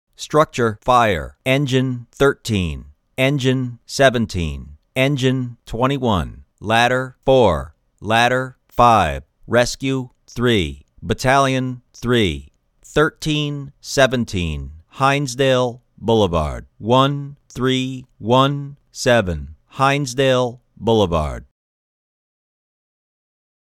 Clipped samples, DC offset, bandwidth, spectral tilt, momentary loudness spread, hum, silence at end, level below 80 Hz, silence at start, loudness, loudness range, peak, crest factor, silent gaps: under 0.1%; under 0.1%; 17 kHz; -5.5 dB/octave; 13 LU; none; 2.2 s; -38 dBFS; 0.2 s; -18 LUFS; 3 LU; 0 dBFS; 18 dB; none